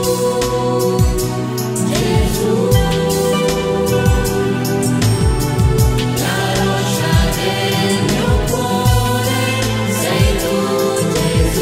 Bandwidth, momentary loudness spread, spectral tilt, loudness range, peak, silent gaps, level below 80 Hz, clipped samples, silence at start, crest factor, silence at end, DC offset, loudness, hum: 16.5 kHz; 3 LU; -5 dB/octave; 0 LU; 0 dBFS; none; -24 dBFS; under 0.1%; 0 s; 14 dB; 0 s; under 0.1%; -15 LUFS; none